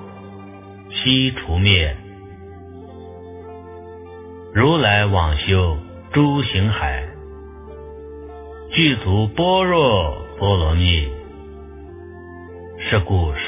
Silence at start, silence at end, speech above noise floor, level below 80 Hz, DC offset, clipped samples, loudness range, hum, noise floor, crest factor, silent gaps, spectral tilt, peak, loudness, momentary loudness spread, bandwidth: 0 s; 0 s; 21 dB; -28 dBFS; under 0.1%; under 0.1%; 4 LU; none; -38 dBFS; 20 dB; none; -10 dB/octave; 0 dBFS; -18 LUFS; 23 LU; 3.8 kHz